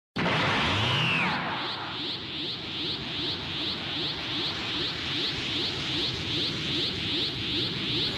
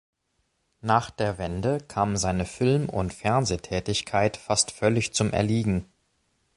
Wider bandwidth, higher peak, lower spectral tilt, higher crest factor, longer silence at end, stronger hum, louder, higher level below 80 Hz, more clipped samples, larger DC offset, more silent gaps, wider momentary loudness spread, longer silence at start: first, 15 kHz vs 11.5 kHz; second, -16 dBFS vs -6 dBFS; about the same, -4 dB/octave vs -4.5 dB/octave; second, 12 dB vs 20 dB; second, 0 s vs 0.75 s; neither; about the same, -28 LUFS vs -26 LUFS; second, -52 dBFS vs -46 dBFS; neither; neither; neither; about the same, 7 LU vs 5 LU; second, 0.15 s vs 0.85 s